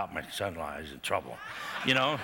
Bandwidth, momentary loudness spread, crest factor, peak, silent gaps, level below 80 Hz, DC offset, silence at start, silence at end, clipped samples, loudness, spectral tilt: 19 kHz; 13 LU; 20 dB; -12 dBFS; none; -62 dBFS; under 0.1%; 0 s; 0 s; under 0.1%; -32 LUFS; -3.5 dB/octave